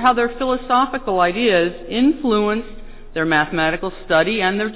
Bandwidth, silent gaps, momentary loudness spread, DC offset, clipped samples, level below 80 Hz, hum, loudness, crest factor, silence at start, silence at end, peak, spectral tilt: 4 kHz; none; 7 LU; under 0.1%; under 0.1%; -42 dBFS; none; -18 LUFS; 14 dB; 0 s; 0 s; -4 dBFS; -9 dB/octave